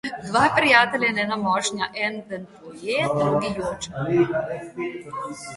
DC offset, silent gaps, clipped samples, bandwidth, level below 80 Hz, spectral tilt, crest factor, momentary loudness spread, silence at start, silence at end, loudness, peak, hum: under 0.1%; none; under 0.1%; 11.5 kHz; -56 dBFS; -4 dB/octave; 20 dB; 17 LU; 0.05 s; 0 s; -22 LUFS; -2 dBFS; none